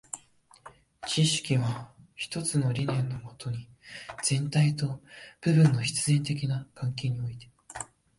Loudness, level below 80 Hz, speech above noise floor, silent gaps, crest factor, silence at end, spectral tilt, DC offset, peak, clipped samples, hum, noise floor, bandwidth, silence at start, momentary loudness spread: -28 LUFS; -60 dBFS; 31 dB; none; 18 dB; 0.35 s; -5 dB/octave; under 0.1%; -12 dBFS; under 0.1%; none; -58 dBFS; 11.5 kHz; 0.15 s; 18 LU